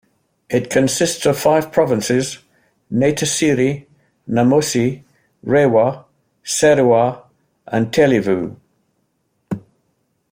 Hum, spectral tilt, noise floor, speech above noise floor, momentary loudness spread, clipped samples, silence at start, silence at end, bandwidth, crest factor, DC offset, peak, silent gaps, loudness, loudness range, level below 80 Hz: none; -5 dB/octave; -67 dBFS; 52 dB; 16 LU; under 0.1%; 0.5 s; 0.7 s; 16.5 kHz; 16 dB; under 0.1%; -2 dBFS; none; -16 LUFS; 2 LU; -54 dBFS